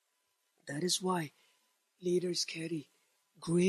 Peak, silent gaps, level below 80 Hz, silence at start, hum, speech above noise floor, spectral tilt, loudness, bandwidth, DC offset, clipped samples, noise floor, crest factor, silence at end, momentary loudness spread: -18 dBFS; none; -78 dBFS; 0.65 s; none; 46 dB; -4.5 dB/octave; -36 LUFS; 14 kHz; under 0.1%; under 0.1%; -80 dBFS; 18 dB; 0 s; 13 LU